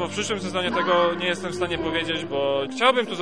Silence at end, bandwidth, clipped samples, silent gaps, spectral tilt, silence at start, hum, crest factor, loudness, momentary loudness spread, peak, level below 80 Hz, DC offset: 0 s; 10.5 kHz; under 0.1%; none; -4 dB/octave; 0 s; none; 20 dB; -23 LUFS; 6 LU; -4 dBFS; -54 dBFS; 0.4%